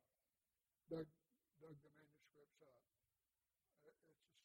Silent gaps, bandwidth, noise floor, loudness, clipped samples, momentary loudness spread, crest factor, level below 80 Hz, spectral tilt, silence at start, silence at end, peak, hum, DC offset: none; 16 kHz; under -90 dBFS; -56 LUFS; under 0.1%; 14 LU; 24 dB; under -90 dBFS; -7.5 dB/octave; 0.9 s; 0.05 s; -38 dBFS; none; under 0.1%